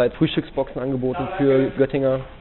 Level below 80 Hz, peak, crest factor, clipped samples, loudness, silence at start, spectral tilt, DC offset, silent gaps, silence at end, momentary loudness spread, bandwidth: -44 dBFS; -6 dBFS; 16 dB; under 0.1%; -21 LUFS; 0 s; -6 dB/octave; under 0.1%; none; 0 s; 7 LU; 4.2 kHz